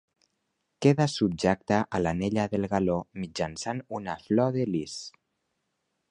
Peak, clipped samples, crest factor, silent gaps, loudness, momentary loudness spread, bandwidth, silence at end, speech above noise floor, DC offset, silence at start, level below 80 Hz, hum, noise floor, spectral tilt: -6 dBFS; under 0.1%; 22 dB; none; -28 LUFS; 11 LU; 11 kHz; 1 s; 52 dB; under 0.1%; 0.8 s; -54 dBFS; none; -79 dBFS; -6 dB/octave